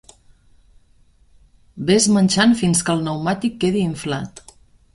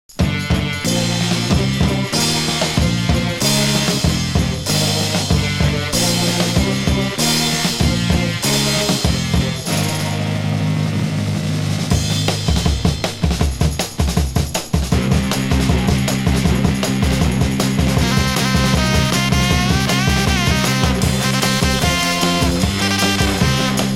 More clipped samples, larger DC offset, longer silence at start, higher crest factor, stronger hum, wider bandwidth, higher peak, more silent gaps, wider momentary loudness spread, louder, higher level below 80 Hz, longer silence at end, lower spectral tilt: neither; neither; first, 1.75 s vs 0.1 s; about the same, 18 dB vs 16 dB; neither; second, 11.5 kHz vs 16 kHz; about the same, -2 dBFS vs 0 dBFS; neither; first, 12 LU vs 4 LU; about the same, -18 LUFS vs -17 LUFS; second, -50 dBFS vs -26 dBFS; first, 0.55 s vs 0 s; about the same, -4.5 dB/octave vs -4.5 dB/octave